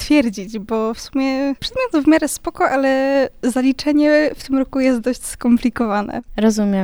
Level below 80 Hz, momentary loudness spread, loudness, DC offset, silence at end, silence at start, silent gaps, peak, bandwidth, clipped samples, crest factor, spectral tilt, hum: -42 dBFS; 7 LU; -18 LUFS; under 0.1%; 0 s; 0 s; none; -2 dBFS; over 20 kHz; under 0.1%; 16 dB; -5 dB/octave; none